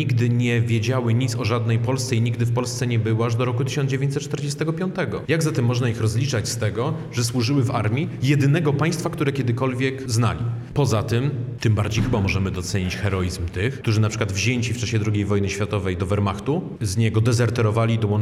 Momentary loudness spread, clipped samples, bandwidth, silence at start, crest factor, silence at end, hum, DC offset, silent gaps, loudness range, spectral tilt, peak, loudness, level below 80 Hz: 5 LU; under 0.1%; 13.5 kHz; 0 s; 14 dB; 0 s; none; under 0.1%; none; 1 LU; -6 dB/octave; -6 dBFS; -22 LUFS; -48 dBFS